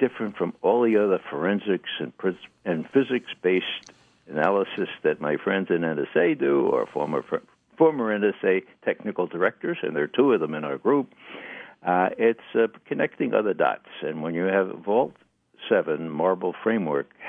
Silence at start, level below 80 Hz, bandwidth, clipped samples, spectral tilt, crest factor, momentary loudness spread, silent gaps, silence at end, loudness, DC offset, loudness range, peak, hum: 0 s; -76 dBFS; 6.4 kHz; under 0.1%; -7.5 dB/octave; 18 dB; 9 LU; none; 0 s; -25 LUFS; under 0.1%; 2 LU; -6 dBFS; none